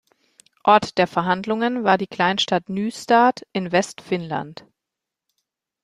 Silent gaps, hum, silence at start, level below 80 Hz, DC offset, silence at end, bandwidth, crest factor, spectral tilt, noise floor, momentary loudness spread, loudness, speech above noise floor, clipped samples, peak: none; none; 0.65 s; -64 dBFS; under 0.1%; 1.3 s; 13 kHz; 20 dB; -5 dB/octave; -85 dBFS; 11 LU; -20 LUFS; 65 dB; under 0.1%; -2 dBFS